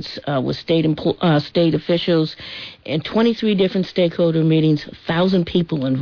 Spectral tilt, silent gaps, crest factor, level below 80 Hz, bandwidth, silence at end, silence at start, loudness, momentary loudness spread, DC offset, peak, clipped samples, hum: -8 dB/octave; none; 12 dB; -50 dBFS; 5.4 kHz; 0 s; 0 s; -19 LUFS; 7 LU; under 0.1%; -6 dBFS; under 0.1%; none